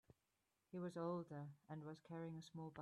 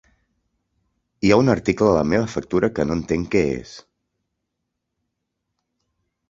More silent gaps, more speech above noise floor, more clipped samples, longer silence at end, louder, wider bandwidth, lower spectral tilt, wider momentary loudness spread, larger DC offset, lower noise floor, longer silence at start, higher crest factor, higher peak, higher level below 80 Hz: neither; second, 37 dB vs 60 dB; neither; second, 0 s vs 2.5 s; second, -52 LUFS vs -20 LUFS; first, 12 kHz vs 7.8 kHz; about the same, -7.5 dB/octave vs -6.5 dB/octave; about the same, 8 LU vs 7 LU; neither; first, -88 dBFS vs -79 dBFS; second, 0.75 s vs 1.2 s; about the same, 18 dB vs 22 dB; second, -34 dBFS vs -2 dBFS; second, -86 dBFS vs -46 dBFS